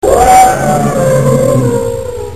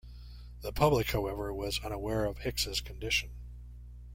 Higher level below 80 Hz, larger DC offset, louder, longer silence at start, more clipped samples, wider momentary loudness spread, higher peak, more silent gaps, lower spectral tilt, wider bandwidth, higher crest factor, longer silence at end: first, -28 dBFS vs -44 dBFS; first, 3% vs under 0.1%; first, -9 LUFS vs -32 LUFS; about the same, 0.05 s vs 0.05 s; first, 1% vs under 0.1%; second, 10 LU vs 22 LU; first, 0 dBFS vs -12 dBFS; neither; about the same, -5.5 dB/octave vs -4.5 dB/octave; second, 14.5 kHz vs 16.5 kHz; second, 8 dB vs 22 dB; about the same, 0 s vs 0 s